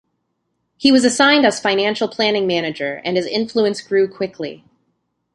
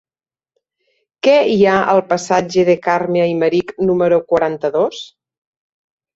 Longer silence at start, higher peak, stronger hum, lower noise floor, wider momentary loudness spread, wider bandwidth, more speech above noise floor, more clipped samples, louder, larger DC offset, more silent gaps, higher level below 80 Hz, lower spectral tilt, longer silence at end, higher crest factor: second, 0.8 s vs 1.25 s; about the same, 0 dBFS vs -2 dBFS; neither; second, -71 dBFS vs under -90 dBFS; first, 11 LU vs 6 LU; first, 11.5 kHz vs 8 kHz; second, 54 dB vs over 76 dB; neither; about the same, -17 LUFS vs -15 LUFS; neither; neither; second, -62 dBFS vs -56 dBFS; second, -3.5 dB/octave vs -5.5 dB/octave; second, 0.8 s vs 1.1 s; about the same, 18 dB vs 14 dB